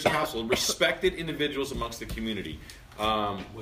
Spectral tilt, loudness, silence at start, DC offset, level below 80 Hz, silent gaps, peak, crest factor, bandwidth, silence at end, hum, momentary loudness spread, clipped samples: -3 dB/octave; -29 LUFS; 0 s; under 0.1%; -46 dBFS; none; -8 dBFS; 20 dB; 15.5 kHz; 0 s; none; 11 LU; under 0.1%